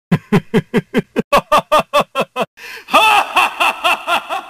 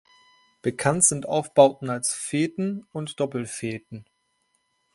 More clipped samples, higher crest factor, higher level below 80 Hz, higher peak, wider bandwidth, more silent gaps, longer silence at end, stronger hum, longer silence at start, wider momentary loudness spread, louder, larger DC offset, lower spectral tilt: neither; second, 16 dB vs 22 dB; first, -44 dBFS vs -64 dBFS; about the same, 0 dBFS vs -2 dBFS; first, 15.5 kHz vs 11.5 kHz; first, 1.24-1.31 s, 2.47-2.57 s vs none; second, 0 s vs 0.95 s; neither; second, 0.1 s vs 0.65 s; second, 9 LU vs 15 LU; first, -14 LUFS vs -24 LUFS; neither; about the same, -4.5 dB/octave vs -4 dB/octave